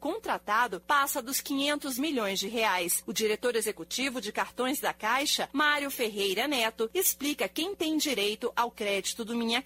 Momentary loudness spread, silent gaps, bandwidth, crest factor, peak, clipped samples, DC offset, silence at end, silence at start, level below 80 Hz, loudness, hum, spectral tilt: 5 LU; none; 16 kHz; 20 dB; -10 dBFS; under 0.1%; under 0.1%; 0 s; 0 s; -66 dBFS; -29 LUFS; none; -1.5 dB/octave